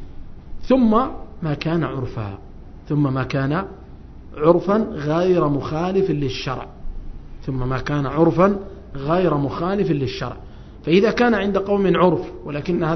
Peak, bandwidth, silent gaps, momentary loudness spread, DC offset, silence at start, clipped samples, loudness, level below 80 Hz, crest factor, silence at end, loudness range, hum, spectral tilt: 0 dBFS; 6.4 kHz; none; 17 LU; under 0.1%; 0 s; under 0.1%; -20 LUFS; -38 dBFS; 20 dB; 0 s; 3 LU; none; -8 dB/octave